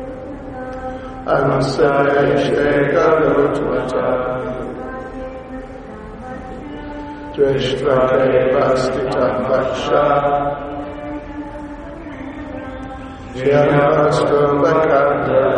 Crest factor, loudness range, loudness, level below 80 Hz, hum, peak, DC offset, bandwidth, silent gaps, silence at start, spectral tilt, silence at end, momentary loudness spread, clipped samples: 16 dB; 9 LU; -16 LUFS; -38 dBFS; none; -2 dBFS; under 0.1%; 9.8 kHz; none; 0 s; -6.5 dB/octave; 0 s; 17 LU; under 0.1%